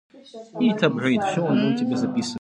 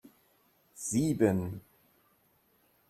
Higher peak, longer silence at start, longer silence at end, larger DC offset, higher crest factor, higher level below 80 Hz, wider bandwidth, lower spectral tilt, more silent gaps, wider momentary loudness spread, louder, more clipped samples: first, -4 dBFS vs -12 dBFS; second, 0.15 s vs 0.75 s; second, 0 s vs 1.3 s; neither; about the same, 18 dB vs 22 dB; about the same, -68 dBFS vs -64 dBFS; second, 10.5 kHz vs 14 kHz; about the same, -6 dB/octave vs -6 dB/octave; neither; second, 6 LU vs 14 LU; first, -22 LUFS vs -31 LUFS; neither